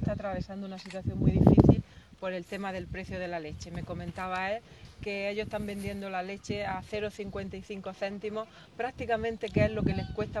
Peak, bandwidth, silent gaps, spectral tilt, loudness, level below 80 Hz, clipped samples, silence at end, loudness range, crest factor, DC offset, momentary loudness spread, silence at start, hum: -4 dBFS; 12.5 kHz; none; -7.5 dB/octave; -31 LUFS; -44 dBFS; under 0.1%; 0 s; 8 LU; 26 dB; under 0.1%; 16 LU; 0 s; none